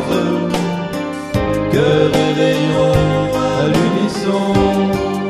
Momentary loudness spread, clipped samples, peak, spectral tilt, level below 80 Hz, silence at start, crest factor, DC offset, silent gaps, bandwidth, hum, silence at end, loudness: 6 LU; under 0.1%; 0 dBFS; -6.5 dB/octave; -36 dBFS; 0 s; 14 dB; under 0.1%; none; 14 kHz; none; 0 s; -15 LUFS